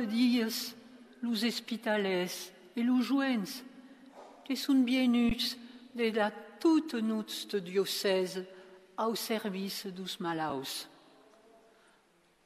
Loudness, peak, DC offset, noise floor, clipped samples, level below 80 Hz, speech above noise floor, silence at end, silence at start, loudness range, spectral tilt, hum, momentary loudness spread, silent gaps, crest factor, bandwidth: -32 LUFS; -16 dBFS; under 0.1%; -68 dBFS; under 0.1%; -60 dBFS; 36 dB; 1.6 s; 0 s; 7 LU; -4 dB/octave; none; 14 LU; none; 16 dB; 14.5 kHz